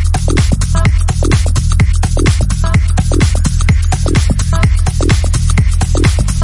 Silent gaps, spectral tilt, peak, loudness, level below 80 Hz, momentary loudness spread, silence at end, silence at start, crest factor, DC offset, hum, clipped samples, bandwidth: none; -5.5 dB/octave; 0 dBFS; -13 LUFS; -14 dBFS; 1 LU; 0 s; 0 s; 10 dB; under 0.1%; none; under 0.1%; 11.5 kHz